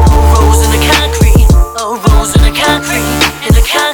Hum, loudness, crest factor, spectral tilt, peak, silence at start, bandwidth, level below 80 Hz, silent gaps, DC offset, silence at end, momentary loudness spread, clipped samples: none; -9 LUFS; 8 dB; -4.5 dB/octave; 0 dBFS; 0 s; 20 kHz; -10 dBFS; none; under 0.1%; 0 s; 4 LU; 2%